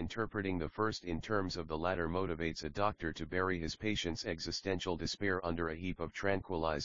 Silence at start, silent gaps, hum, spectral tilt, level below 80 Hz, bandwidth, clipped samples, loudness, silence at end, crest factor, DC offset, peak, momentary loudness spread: 0 s; none; none; -4 dB/octave; -54 dBFS; 7.4 kHz; under 0.1%; -37 LUFS; 0 s; 20 dB; 0.2%; -18 dBFS; 3 LU